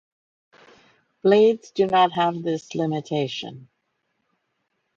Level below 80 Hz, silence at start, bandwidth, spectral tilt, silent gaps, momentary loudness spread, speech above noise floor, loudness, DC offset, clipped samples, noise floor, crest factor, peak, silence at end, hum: -70 dBFS; 1.25 s; 7.6 kHz; -6 dB/octave; none; 11 LU; 53 dB; -22 LUFS; under 0.1%; under 0.1%; -74 dBFS; 18 dB; -6 dBFS; 1.3 s; none